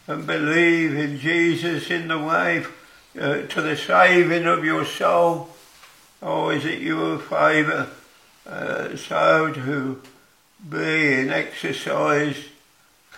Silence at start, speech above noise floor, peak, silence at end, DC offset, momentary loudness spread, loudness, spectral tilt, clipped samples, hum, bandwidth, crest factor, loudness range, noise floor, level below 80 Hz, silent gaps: 0.1 s; 36 dB; -2 dBFS; 0 s; under 0.1%; 11 LU; -21 LUFS; -5.5 dB/octave; under 0.1%; none; 15.5 kHz; 20 dB; 4 LU; -57 dBFS; -68 dBFS; none